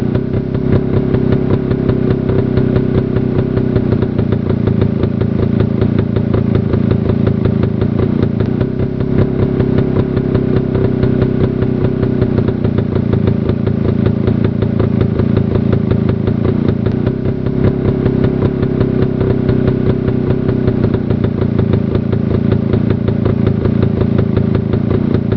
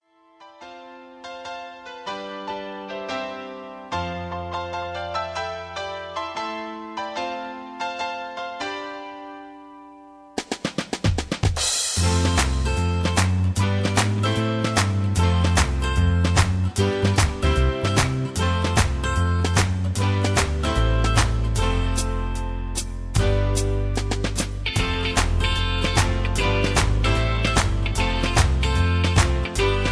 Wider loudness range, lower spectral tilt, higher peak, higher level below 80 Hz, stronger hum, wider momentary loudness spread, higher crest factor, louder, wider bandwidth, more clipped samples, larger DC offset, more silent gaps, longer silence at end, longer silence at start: second, 0 LU vs 10 LU; first, -11.5 dB/octave vs -4.5 dB/octave; first, 0 dBFS vs -4 dBFS; about the same, -28 dBFS vs -28 dBFS; neither; second, 2 LU vs 13 LU; second, 12 dB vs 20 dB; first, -14 LUFS vs -23 LUFS; second, 5.4 kHz vs 11 kHz; neither; first, 0.2% vs under 0.1%; neither; about the same, 0 s vs 0 s; second, 0 s vs 0.4 s